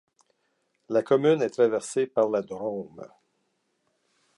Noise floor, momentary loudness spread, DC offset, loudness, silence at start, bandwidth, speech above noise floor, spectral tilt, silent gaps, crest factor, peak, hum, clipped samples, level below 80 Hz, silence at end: -74 dBFS; 14 LU; under 0.1%; -25 LUFS; 0.9 s; 11.5 kHz; 49 dB; -5.5 dB/octave; none; 18 dB; -10 dBFS; none; under 0.1%; -76 dBFS; 1.3 s